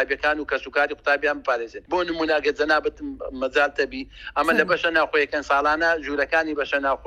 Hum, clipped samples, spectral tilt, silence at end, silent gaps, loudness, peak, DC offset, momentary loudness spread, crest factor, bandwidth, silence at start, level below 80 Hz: none; under 0.1%; -4 dB/octave; 0 s; none; -22 LUFS; -4 dBFS; under 0.1%; 8 LU; 18 dB; 13.5 kHz; 0 s; -50 dBFS